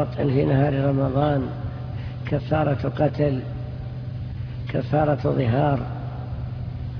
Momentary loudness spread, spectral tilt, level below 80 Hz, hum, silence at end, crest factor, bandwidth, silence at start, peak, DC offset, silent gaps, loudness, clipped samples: 12 LU; -10.5 dB/octave; -40 dBFS; none; 0 s; 16 dB; 5.4 kHz; 0 s; -8 dBFS; under 0.1%; none; -24 LUFS; under 0.1%